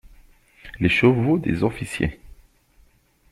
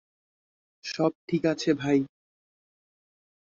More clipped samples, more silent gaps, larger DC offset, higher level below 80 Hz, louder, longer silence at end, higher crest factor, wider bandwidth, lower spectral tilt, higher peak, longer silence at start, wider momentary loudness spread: neither; second, none vs 1.15-1.28 s; neither; first, -44 dBFS vs -68 dBFS; first, -21 LUFS vs -27 LUFS; second, 1.05 s vs 1.35 s; about the same, 20 dB vs 20 dB; first, 13.5 kHz vs 7.6 kHz; about the same, -7 dB/octave vs -6 dB/octave; first, -4 dBFS vs -10 dBFS; second, 0.05 s vs 0.85 s; second, 10 LU vs 13 LU